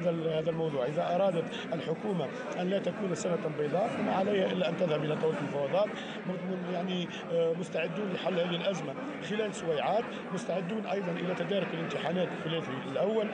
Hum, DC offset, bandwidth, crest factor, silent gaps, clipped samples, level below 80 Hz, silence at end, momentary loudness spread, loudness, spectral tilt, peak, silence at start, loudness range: none; under 0.1%; 10 kHz; 12 dB; none; under 0.1%; -74 dBFS; 0 s; 6 LU; -32 LUFS; -6 dB/octave; -20 dBFS; 0 s; 2 LU